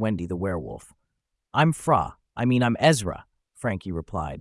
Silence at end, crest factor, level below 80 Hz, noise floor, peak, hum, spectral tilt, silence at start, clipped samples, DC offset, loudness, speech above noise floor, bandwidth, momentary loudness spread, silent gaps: 0 s; 20 dB; -50 dBFS; -79 dBFS; -6 dBFS; none; -6 dB/octave; 0 s; under 0.1%; under 0.1%; -25 LUFS; 55 dB; 12 kHz; 13 LU; none